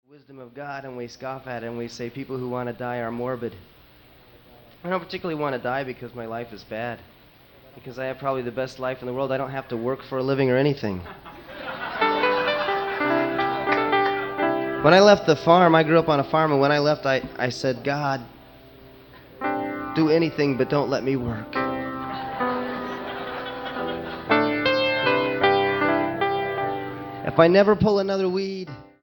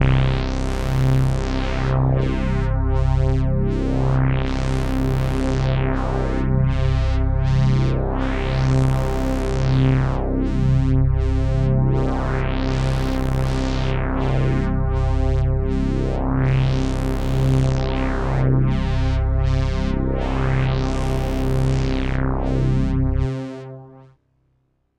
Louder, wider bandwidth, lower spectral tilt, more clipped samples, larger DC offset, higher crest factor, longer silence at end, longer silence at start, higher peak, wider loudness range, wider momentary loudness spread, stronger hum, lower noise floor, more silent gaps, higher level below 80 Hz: about the same, -23 LUFS vs -21 LUFS; first, 17.5 kHz vs 9.4 kHz; second, -6 dB/octave vs -8 dB/octave; neither; neither; first, 22 dB vs 12 dB; second, 0.2 s vs 0.95 s; first, 0.3 s vs 0 s; first, 0 dBFS vs -6 dBFS; first, 13 LU vs 2 LU; first, 16 LU vs 4 LU; neither; second, -52 dBFS vs -66 dBFS; neither; second, -54 dBFS vs -22 dBFS